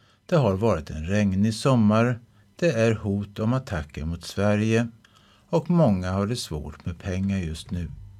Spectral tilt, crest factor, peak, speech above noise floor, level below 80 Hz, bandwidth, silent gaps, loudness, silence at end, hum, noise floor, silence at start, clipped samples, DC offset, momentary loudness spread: -7 dB/octave; 16 dB; -8 dBFS; 33 dB; -44 dBFS; 13.5 kHz; none; -25 LUFS; 0 s; none; -56 dBFS; 0.3 s; under 0.1%; under 0.1%; 12 LU